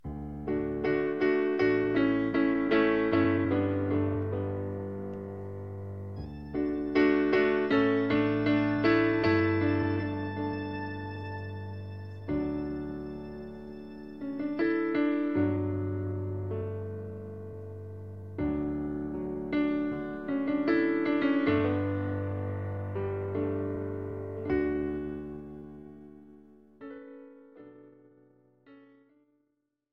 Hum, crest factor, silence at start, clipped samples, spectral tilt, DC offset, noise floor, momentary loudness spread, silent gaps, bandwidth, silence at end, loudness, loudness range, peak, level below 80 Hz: none; 18 dB; 0.05 s; under 0.1%; -9 dB/octave; 0.1%; -79 dBFS; 17 LU; none; 5.8 kHz; 1.05 s; -30 LUFS; 10 LU; -12 dBFS; -54 dBFS